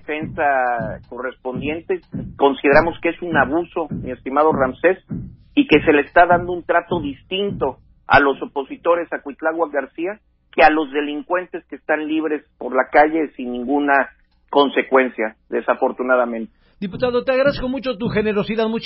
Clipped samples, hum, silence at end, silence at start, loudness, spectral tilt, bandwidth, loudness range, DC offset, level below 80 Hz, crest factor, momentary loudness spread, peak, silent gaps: under 0.1%; none; 0 s; 0.1 s; -19 LUFS; -10.5 dB/octave; 5.8 kHz; 3 LU; under 0.1%; -46 dBFS; 18 dB; 13 LU; 0 dBFS; none